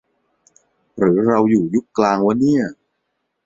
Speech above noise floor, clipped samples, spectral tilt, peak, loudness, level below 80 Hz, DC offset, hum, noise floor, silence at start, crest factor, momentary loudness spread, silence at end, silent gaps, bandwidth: 57 dB; under 0.1%; -7.5 dB/octave; -2 dBFS; -17 LUFS; -58 dBFS; under 0.1%; none; -73 dBFS; 0.95 s; 18 dB; 5 LU; 0.7 s; none; 7.8 kHz